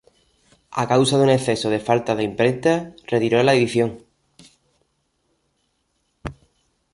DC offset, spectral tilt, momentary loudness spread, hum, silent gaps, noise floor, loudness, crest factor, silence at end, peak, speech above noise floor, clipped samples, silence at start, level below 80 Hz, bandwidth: under 0.1%; -5.5 dB/octave; 15 LU; none; none; -70 dBFS; -19 LUFS; 18 dB; 0.6 s; -4 dBFS; 51 dB; under 0.1%; 0.7 s; -54 dBFS; 11.5 kHz